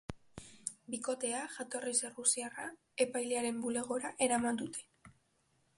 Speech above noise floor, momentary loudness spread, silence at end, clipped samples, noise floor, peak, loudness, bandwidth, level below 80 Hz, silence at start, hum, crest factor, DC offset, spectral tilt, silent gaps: 39 dB; 13 LU; 0.7 s; under 0.1%; -75 dBFS; -16 dBFS; -36 LUFS; 11.5 kHz; -68 dBFS; 0.1 s; none; 22 dB; under 0.1%; -2.5 dB/octave; none